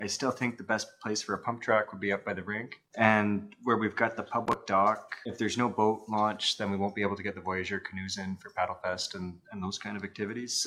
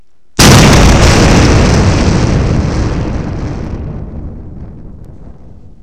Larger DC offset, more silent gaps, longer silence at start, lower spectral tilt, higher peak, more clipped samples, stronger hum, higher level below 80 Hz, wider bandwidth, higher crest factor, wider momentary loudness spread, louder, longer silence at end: second, under 0.1% vs 2%; neither; second, 0 s vs 0.4 s; about the same, -4 dB/octave vs -5 dB/octave; second, -6 dBFS vs 0 dBFS; second, under 0.1% vs 0.4%; neither; second, -70 dBFS vs -16 dBFS; second, 13.5 kHz vs over 20 kHz; first, 26 dB vs 10 dB; second, 10 LU vs 21 LU; second, -31 LUFS vs -8 LUFS; second, 0 s vs 0.55 s